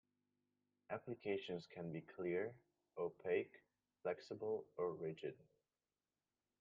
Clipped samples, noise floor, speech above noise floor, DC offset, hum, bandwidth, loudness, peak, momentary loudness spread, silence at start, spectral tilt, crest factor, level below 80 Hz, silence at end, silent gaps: under 0.1%; under -90 dBFS; over 44 dB; under 0.1%; none; 7.2 kHz; -47 LUFS; -28 dBFS; 9 LU; 0.9 s; -5 dB/octave; 20 dB; -88 dBFS; 1.2 s; none